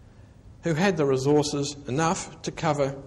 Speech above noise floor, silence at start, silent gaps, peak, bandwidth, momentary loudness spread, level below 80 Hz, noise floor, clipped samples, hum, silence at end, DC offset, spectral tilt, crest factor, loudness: 25 dB; 0.45 s; none; -10 dBFS; 12 kHz; 8 LU; -52 dBFS; -49 dBFS; under 0.1%; none; 0 s; under 0.1%; -5 dB/octave; 16 dB; -25 LUFS